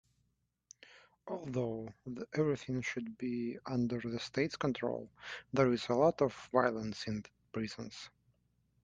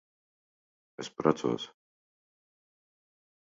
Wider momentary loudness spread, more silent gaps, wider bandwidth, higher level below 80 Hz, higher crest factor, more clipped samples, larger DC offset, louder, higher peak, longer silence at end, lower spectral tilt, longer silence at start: about the same, 15 LU vs 15 LU; neither; first, 9.4 kHz vs 7.4 kHz; first, -68 dBFS vs -74 dBFS; about the same, 24 dB vs 26 dB; neither; neither; second, -36 LUFS vs -31 LUFS; about the same, -14 dBFS vs -12 dBFS; second, 0.75 s vs 1.75 s; about the same, -6 dB/octave vs -5 dB/octave; about the same, 0.95 s vs 1 s